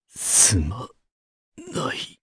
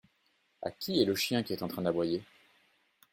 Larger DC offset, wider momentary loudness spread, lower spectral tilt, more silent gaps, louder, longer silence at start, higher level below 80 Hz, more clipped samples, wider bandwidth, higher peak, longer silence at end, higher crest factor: neither; first, 18 LU vs 11 LU; second, -2 dB/octave vs -5 dB/octave; first, 1.12-1.52 s vs none; first, -18 LUFS vs -32 LUFS; second, 0.15 s vs 0.6 s; first, -40 dBFS vs -70 dBFS; neither; second, 11 kHz vs 16.5 kHz; first, -2 dBFS vs -14 dBFS; second, 0.15 s vs 0.9 s; about the same, 22 dB vs 22 dB